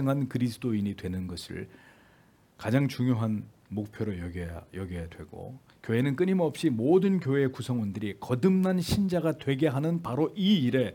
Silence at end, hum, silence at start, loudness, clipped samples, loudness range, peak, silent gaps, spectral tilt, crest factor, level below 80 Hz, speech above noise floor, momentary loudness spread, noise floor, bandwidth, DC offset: 0 s; none; 0 s; -28 LUFS; under 0.1%; 6 LU; -10 dBFS; none; -7 dB/octave; 18 dB; -58 dBFS; 33 dB; 15 LU; -61 dBFS; 17.5 kHz; under 0.1%